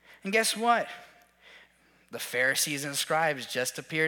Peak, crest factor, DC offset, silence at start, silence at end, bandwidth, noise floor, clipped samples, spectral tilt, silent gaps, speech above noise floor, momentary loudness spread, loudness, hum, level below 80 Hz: -10 dBFS; 20 dB; under 0.1%; 0.1 s; 0 s; 19 kHz; -62 dBFS; under 0.1%; -2 dB/octave; none; 33 dB; 14 LU; -28 LUFS; none; -78 dBFS